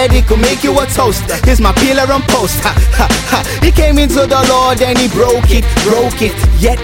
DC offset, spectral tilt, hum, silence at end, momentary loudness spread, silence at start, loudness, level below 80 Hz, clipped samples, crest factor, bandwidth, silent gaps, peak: under 0.1%; -4.5 dB/octave; none; 0 s; 3 LU; 0 s; -10 LUFS; -14 dBFS; under 0.1%; 10 dB; 17 kHz; none; 0 dBFS